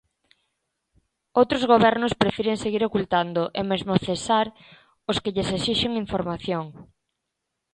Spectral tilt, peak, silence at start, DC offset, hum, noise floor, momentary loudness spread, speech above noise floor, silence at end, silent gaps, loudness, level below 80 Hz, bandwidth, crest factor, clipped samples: -5.5 dB/octave; -4 dBFS; 1.35 s; under 0.1%; none; -81 dBFS; 10 LU; 58 dB; 0.9 s; none; -23 LUFS; -52 dBFS; 11 kHz; 22 dB; under 0.1%